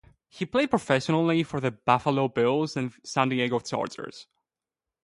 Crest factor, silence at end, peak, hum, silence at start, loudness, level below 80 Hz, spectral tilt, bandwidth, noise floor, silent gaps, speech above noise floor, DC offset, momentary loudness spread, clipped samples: 20 dB; 0.8 s; -6 dBFS; none; 0.35 s; -26 LUFS; -64 dBFS; -6 dB/octave; 11.5 kHz; under -90 dBFS; none; over 64 dB; under 0.1%; 9 LU; under 0.1%